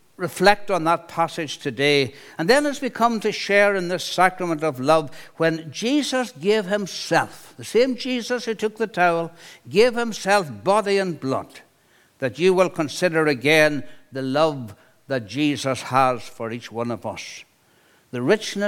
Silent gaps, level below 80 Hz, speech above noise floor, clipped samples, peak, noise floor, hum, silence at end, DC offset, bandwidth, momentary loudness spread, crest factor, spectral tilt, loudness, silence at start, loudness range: none; -58 dBFS; 37 dB; under 0.1%; 0 dBFS; -58 dBFS; none; 0 s; under 0.1%; 17 kHz; 12 LU; 22 dB; -4.5 dB/octave; -21 LUFS; 0.2 s; 4 LU